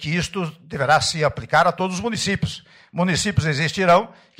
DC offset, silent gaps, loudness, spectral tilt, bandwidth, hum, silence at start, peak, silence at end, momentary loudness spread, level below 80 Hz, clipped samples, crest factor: under 0.1%; none; -20 LUFS; -4.5 dB/octave; 16 kHz; none; 0 s; -6 dBFS; 0.3 s; 12 LU; -46 dBFS; under 0.1%; 16 dB